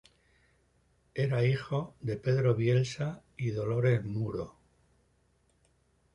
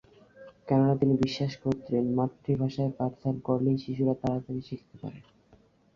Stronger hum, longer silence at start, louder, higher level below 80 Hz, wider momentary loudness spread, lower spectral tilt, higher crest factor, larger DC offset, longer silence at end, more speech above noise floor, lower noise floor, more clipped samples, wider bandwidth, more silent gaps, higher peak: neither; first, 1.15 s vs 0.4 s; about the same, -31 LUFS vs -29 LUFS; about the same, -60 dBFS vs -58 dBFS; second, 10 LU vs 16 LU; about the same, -7.5 dB/octave vs -8.5 dB/octave; about the same, 18 dB vs 18 dB; neither; first, 1.65 s vs 0.75 s; first, 41 dB vs 33 dB; first, -70 dBFS vs -61 dBFS; neither; first, 10 kHz vs 7.2 kHz; neither; second, -16 dBFS vs -12 dBFS